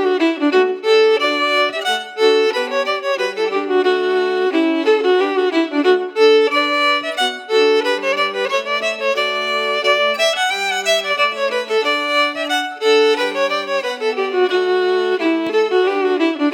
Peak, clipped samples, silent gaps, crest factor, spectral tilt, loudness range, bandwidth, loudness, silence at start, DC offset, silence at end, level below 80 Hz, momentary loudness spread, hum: -2 dBFS; under 0.1%; none; 16 dB; -1.5 dB/octave; 2 LU; 17 kHz; -16 LUFS; 0 s; under 0.1%; 0 s; -86 dBFS; 5 LU; none